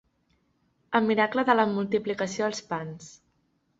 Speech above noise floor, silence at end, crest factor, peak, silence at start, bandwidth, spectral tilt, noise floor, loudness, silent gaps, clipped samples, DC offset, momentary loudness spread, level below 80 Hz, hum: 45 dB; 0.7 s; 22 dB; -6 dBFS; 0.9 s; 8 kHz; -5 dB/octave; -71 dBFS; -26 LUFS; none; under 0.1%; under 0.1%; 11 LU; -68 dBFS; none